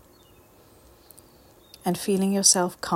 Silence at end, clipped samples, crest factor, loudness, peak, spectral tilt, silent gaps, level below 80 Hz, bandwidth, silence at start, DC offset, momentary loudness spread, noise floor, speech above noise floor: 0 s; under 0.1%; 24 dB; -22 LUFS; -4 dBFS; -3 dB/octave; none; -62 dBFS; 16.5 kHz; 1.85 s; under 0.1%; 12 LU; -55 dBFS; 32 dB